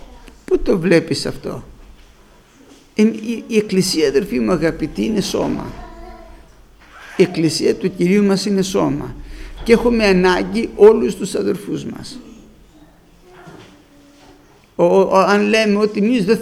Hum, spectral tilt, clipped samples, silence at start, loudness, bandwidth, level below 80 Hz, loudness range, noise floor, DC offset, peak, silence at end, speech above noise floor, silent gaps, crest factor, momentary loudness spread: none; -5.5 dB/octave; under 0.1%; 0.1 s; -16 LUFS; 15 kHz; -38 dBFS; 6 LU; -47 dBFS; under 0.1%; 0 dBFS; 0 s; 32 dB; none; 18 dB; 17 LU